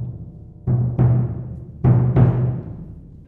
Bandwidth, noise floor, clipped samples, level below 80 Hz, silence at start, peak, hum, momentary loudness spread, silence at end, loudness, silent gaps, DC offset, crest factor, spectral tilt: 2.8 kHz; -37 dBFS; under 0.1%; -36 dBFS; 0 s; -2 dBFS; none; 21 LU; 0.1 s; -19 LUFS; none; under 0.1%; 18 dB; -12.5 dB/octave